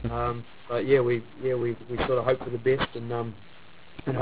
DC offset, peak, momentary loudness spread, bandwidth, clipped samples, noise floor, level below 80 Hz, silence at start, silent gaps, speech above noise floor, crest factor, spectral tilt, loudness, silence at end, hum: 0.6%; -8 dBFS; 14 LU; 4 kHz; under 0.1%; -48 dBFS; -48 dBFS; 0 s; none; 21 dB; 20 dB; -10.5 dB/octave; -28 LUFS; 0 s; none